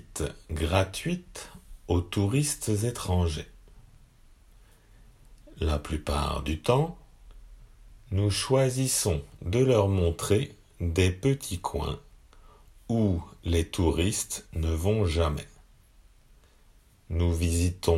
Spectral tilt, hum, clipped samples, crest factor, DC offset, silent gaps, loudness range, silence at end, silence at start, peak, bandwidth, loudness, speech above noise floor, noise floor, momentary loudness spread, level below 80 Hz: -5.5 dB/octave; none; under 0.1%; 20 dB; under 0.1%; none; 6 LU; 0 s; 0.1 s; -10 dBFS; 16 kHz; -28 LUFS; 32 dB; -58 dBFS; 10 LU; -42 dBFS